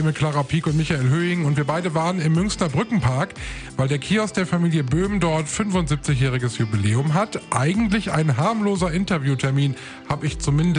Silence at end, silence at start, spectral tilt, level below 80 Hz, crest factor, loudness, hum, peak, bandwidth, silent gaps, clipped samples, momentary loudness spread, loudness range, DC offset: 0 s; 0 s; -6 dB/octave; -40 dBFS; 16 dB; -21 LUFS; none; -6 dBFS; 10.5 kHz; none; under 0.1%; 4 LU; 1 LU; under 0.1%